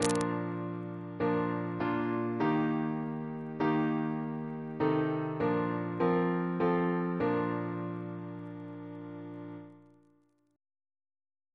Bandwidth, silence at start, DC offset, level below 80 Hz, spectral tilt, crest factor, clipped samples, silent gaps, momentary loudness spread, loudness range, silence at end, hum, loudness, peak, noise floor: 11 kHz; 0 s; under 0.1%; -68 dBFS; -7 dB/octave; 24 dB; under 0.1%; none; 14 LU; 12 LU; 1.75 s; none; -32 LUFS; -8 dBFS; -69 dBFS